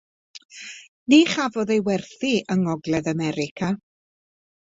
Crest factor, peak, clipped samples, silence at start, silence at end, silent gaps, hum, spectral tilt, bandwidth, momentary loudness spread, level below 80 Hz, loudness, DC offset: 20 dB; -4 dBFS; under 0.1%; 0.35 s; 0.95 s; 0.45-0.49 s, 0.88-1.06 s, 3.51-3.56 s; none; -5.5 dB/octave; 8 kHz; 21 LU; -60 dBFS; -22 LUFS; under 0.1%